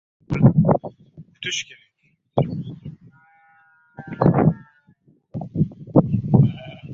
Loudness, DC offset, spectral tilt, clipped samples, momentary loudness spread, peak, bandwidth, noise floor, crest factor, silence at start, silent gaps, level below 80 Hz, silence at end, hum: -20 LUFS; under 0.1%; -7.5 dB/octave; under 0.1%; 20 LU; -2 dBFS; 7.6 kHz; -66 dBFS; 20 dB; 0.3 s; none; -46 dBFS; 0 s; none